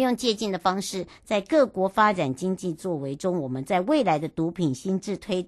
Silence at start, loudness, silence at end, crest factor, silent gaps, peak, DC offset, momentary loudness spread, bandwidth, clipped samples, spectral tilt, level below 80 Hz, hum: 0 s; -25 LUFS; 0 s; 18 dB; none; -6 dBFS; under 0.1%; 8 LU; 12.5 kHz; under 0.1%; -5.5 dB/octave; -60 dBFS; none